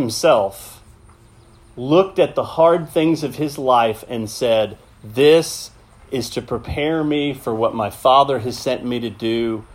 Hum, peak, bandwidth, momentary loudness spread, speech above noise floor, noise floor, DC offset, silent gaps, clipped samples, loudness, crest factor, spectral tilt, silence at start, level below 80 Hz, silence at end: none; 0 dBFS; 16 kHz; 12 LU; 30 dB; -48 dBFS; under 0.1%; none; under 0.1%; -18 LUFS; 18 dB; -5 dB/octave; 0 s; -48 dBFS; 0 s